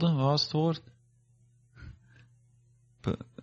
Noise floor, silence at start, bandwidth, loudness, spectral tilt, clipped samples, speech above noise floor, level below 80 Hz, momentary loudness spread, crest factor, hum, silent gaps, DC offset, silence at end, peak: -64 dBFS; 0 s; 7.6 kHz; -30 LUFS; -7 dB/octave; under 0.1%; 36 dB; -60 dBFS; 25 LU; 18 dB; none; none; under 0.1%; 0.2 s; -16 dBFS